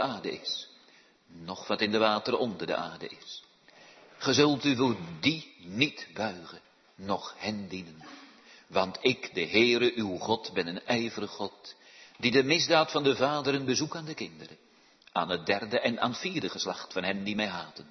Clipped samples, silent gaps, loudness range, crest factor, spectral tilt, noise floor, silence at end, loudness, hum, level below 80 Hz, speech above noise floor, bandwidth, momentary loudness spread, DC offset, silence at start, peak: under 0.1%; none; 5 LU; 22 dB; -4 dB/octave; -60 dBFS; 0.05 s; -29 LUFS; none; -72 dBFS; 30 dB; 6.4 kHz; 19 LU; under 0.1%; 0 s; -8 dBFS